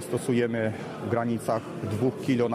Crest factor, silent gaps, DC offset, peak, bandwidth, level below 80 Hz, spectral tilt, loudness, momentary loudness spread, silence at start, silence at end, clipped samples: 16 dB; none; under 0.1%; -12 dBFS; 14.5 kHz; -66 dBFS; -6.5 dB/octave; -28 LUFS; 5 LU; 0 s; 0 s; under 0.1%